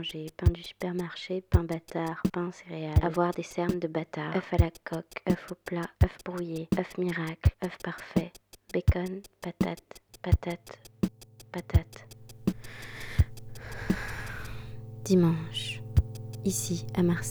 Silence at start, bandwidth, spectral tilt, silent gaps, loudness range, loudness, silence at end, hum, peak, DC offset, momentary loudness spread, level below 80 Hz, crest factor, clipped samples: 0 s; over 20 kHz; -6 dB/octave; none; 3 LU; -31 LUFS; 0 s; none; -10 dBFS; under 0.1%; 14 LU; -40 dBFS; 20 dB; under 0.1%